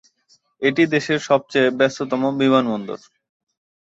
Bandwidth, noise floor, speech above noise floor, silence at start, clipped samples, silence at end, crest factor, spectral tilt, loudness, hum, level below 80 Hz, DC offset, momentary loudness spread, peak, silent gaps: 8 kHz; -60 dBFS; 42 dB; 0.6 s; under 0.1%; 1 s; 18 dB; -5.5 dB/octave; -19 LUFS; none; -66 dBFS; under 0.1%; 9 LU; -2 dBFS; none